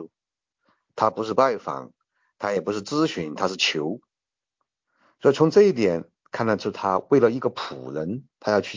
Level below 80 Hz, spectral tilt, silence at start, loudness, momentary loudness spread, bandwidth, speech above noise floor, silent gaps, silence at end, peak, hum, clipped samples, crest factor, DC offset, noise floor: -62 dBFS; -5.5 dB/octave; 0 s; -23 LUFS; 14 LU; 7.6 kHz; 67 dB; none; 0 s; -4 dBFS; none; under 0.1%; 20 dB; under 0.1%; -90 dBFS